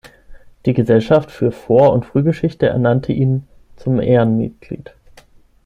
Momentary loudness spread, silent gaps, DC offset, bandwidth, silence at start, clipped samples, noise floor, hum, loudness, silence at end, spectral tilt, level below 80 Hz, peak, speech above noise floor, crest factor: 12 LU; none; under 0.1%; 7.4 kHz; 0.05 s; under 0.1%; -47 dBFS; none; -16 LUFS; 0.9 s; -9.5 dB/octave; -44 dBFS; -2 dBFS; 32 dB; 16 dB